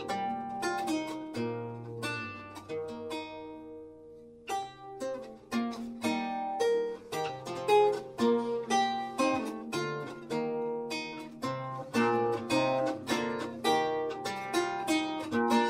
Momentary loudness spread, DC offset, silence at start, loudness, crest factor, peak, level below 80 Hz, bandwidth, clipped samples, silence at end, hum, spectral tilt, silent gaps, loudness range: 12 LU; under 0.1%; 0 s; -32 LUFS; 18 dB; -14 dBFS; -70 dBFS; 16 kHz; under 0.1%; 0 s; none; -4.5 dB/octave; none; 9 LU